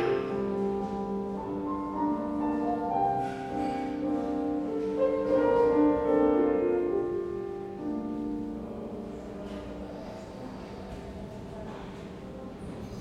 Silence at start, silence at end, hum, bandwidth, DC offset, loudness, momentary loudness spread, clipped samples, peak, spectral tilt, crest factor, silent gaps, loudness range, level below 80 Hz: 0 s; 0 s; none; 9.6 kHz; under 0.1%; -30 LUFS; 17 LU; under 0.1%; -14 dBFS; -8 dB/octave; 16 dB; none; 14 LU; -52 dBFS